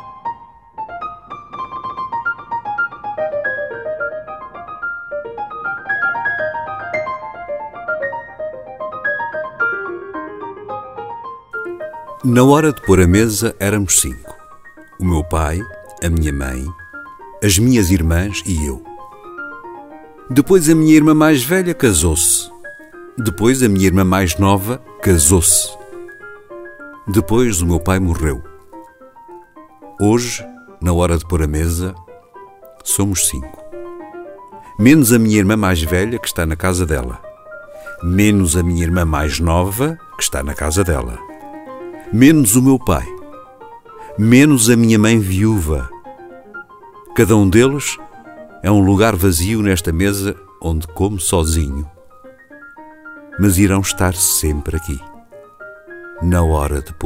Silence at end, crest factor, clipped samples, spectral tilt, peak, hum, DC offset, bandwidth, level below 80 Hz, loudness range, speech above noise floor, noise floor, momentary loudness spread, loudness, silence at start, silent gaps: 0 s; 16 dB; under 0.1%; -5 dB/octave; 0 dBFS; none; under 0.1%; 16.5 kHz; -30 dBFS; 9 LU; 28 dB; -42 dBFS; 23 LU; -15 LUFS; 0 s; none